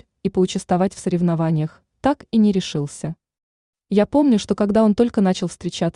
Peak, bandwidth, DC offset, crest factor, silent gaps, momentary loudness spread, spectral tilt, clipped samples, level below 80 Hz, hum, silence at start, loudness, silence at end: -4 dBFS; 11 kHz; under 0.1%; 16 dB; 3.43-3.73 s; 10 LU; -6.5 dB/octave; under 0.1%; -50 dBFS; none; 0.25 s; -20 LUFS; 0.05 s